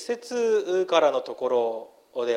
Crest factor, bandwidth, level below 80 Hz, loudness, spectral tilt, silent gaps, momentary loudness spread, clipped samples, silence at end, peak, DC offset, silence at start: 18 dB; 12.5 kHz; -80 dBFS; -25 LUFS; -3.5 dB/octave; none; 10 LU; under 0.1%; 0 s; -8 dBFS; under 0.1%; 0 s